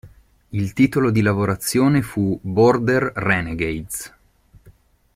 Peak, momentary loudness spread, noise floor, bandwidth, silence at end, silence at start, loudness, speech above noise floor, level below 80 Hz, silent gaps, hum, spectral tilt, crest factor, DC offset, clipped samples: -4 dBFS; 12 LU; -53 dBFS; 16 kHz; 0.45 s; 0.05 s; -19 LUFS; 34 dB; -46 dBFS; none; none; -6 dB/octave; 16 dB; under 0.1%; under 0.1%